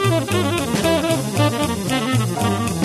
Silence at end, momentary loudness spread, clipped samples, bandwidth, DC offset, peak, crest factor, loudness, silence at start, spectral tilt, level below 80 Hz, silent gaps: 0 s; 2 LU; under 0.1%; 13 kHz; under 0.1%; -4 dBFS; 14 dB; -19 LUFS; 0 s; -5 dB/octave; -42 dBFS; none